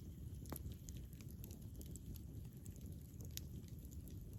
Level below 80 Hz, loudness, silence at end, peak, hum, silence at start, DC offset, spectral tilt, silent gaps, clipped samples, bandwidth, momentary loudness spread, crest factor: -58 dBFS; -53 LUFS; 0 s; -28 dBFS; none; 0 s; under 0.1%; -5.5 dB/octave; none; under 0.1%; 17 kHz; 4 LU; 24 dB